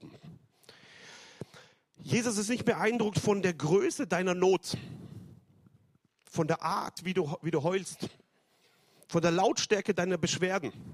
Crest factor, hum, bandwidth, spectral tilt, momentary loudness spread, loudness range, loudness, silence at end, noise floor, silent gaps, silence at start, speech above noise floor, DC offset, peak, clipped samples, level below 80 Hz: 18 dB; none; 14.5 kHz; -4.5 dB/octave; 21 LU; 5 LU; -30 LUFS; 0 s; -69 dBFS; none; 0 s; 40 dB; under 0.1%; -12 dBFS; under 0.1%; -68 dBFS